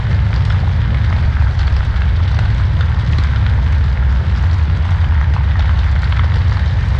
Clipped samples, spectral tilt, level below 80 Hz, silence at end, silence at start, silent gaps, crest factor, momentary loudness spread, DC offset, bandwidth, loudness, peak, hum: under 0.1%; -7.5 dB/octave; -16 dBFS; 0 s; 0 s; none; 10 dB; 1 LU; under 0.1%; 6.2 kHz; -15 LUFS; -2 dBFS; none